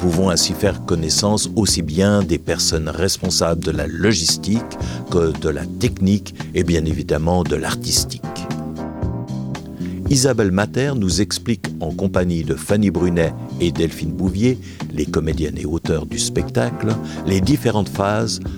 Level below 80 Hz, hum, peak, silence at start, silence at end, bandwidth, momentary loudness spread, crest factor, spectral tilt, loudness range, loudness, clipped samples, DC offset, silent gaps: -34 dBFS; none; -2 dBFS; 0 s; 0 s; 18 kHz; 10 LU; 16 dB; -4.5 dB/octave; 3 LU; -19 LUFS; under 0.1%; under 0.1%; none